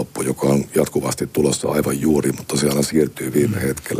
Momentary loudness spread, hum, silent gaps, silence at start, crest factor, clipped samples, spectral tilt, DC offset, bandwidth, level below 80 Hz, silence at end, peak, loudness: 4 LU; none; none; 0 s; 16 dB; under 0.1%; -5 dB/octave; under 0.1%; 15.5 kHz; -46 dBFS; 0 s; -4 dBFS; -19 LUFS